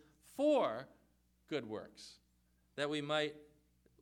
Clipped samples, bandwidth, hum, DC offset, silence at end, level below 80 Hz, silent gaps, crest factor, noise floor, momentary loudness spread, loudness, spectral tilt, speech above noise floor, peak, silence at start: under 0.1%; 16.5 kHz; none; under 0.1%; 0.6 s; -76 dBFS; none; 18 dB; -74 dBFS; 23 LU; -38 LUFS; -5 dB/octave; 37 dB; -22 dBFS; 0.35 s